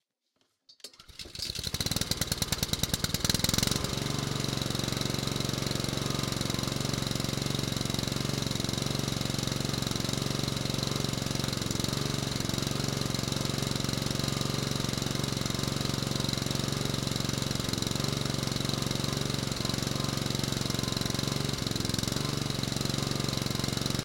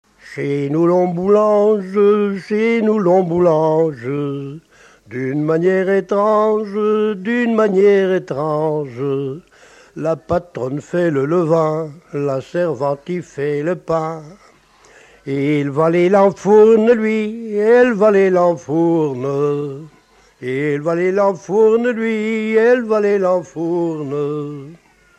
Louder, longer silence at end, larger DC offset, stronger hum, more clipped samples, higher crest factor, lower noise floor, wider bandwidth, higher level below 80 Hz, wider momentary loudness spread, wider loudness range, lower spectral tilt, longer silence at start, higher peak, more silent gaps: second, -30 LUFS vs -16 LUFS; second, 0 s vs 0.45 s; neither; neither; neither; first, 24 dB vs 14 dB; first, -76 dBFS vs -49 dBFS; first, 17 kHz vs 8.6 kHz; first, -48 dBFS vs -56 dBFS; second, 2 LU vs 12 LU; second, 2 LU vs 7 LU; second, -4 dB/octave vs -7.5 dB/octave; first, 0.7 s vs 0.25 s; second, -8 dBFS vs -2 dBFS; neither